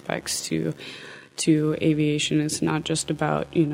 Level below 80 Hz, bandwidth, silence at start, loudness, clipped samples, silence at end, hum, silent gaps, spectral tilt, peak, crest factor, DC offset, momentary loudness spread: -56 dBFS; 16 kHz; 0.05 s; -24 LUFS; under 0.1%; 0 s; none; none; -4.5 dB/octave; -6 dBFS; 18 dB; under 0.1%; 13 LU